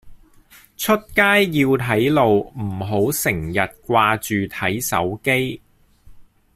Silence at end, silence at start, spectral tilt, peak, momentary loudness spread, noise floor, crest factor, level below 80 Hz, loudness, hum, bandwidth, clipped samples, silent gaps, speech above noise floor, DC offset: 0.35 s; 0.05 s; -4.5 dB/octave; -2 dBFS; 8 LU; -49 dBFS; 18 dB; -48 dBFS; -19 LUFS; none; 16 kHz; under 0.1%; none; 31 dB; under 0.1%